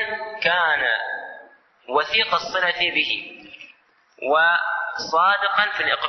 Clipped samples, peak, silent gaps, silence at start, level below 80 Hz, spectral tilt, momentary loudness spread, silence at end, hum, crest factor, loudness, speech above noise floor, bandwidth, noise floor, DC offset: under 0.1%; -4 dBFS; none; 0 s; -64 dBFS; -2 dB/octave; 14 LU; 0 s; none; 18 dB; -20 LUFS; 36 dB; 6.4 kHz; -56 dBFS; under 0.1%